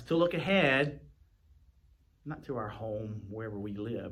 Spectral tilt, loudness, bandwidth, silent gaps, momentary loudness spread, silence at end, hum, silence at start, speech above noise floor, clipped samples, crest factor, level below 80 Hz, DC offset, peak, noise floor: -7 dB/octave; -32 LUFS; 13 kHz; none; 18 LU; 0 s; none; 0 s; 33 dB; under 0.1%; 20 dB; -60 dBFS; under 0.1%; -14 dBFS; -65 dBFS